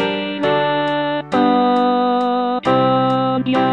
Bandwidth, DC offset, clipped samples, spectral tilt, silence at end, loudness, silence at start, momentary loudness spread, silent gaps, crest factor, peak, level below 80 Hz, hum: 8.8 kHz; 0.2%; under 0.1%; -7 dB/octave; 0 s; -17 LUFS; 0 s; 4 LU; none; 12 dB; -4 dBFS; -56 dBFS; none